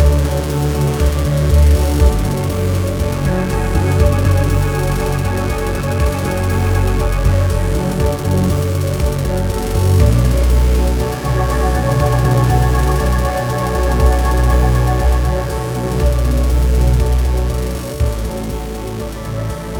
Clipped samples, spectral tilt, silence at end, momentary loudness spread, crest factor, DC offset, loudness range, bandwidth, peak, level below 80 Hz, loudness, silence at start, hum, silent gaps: under 0.1%; -6.5 dB/octave; 0 s; 6 LU; 14 dB; under 0.1%; 2 LU; 19 kHz; 0 dBFS; -16 dBFS; -16 LUFS; 0 s; none; none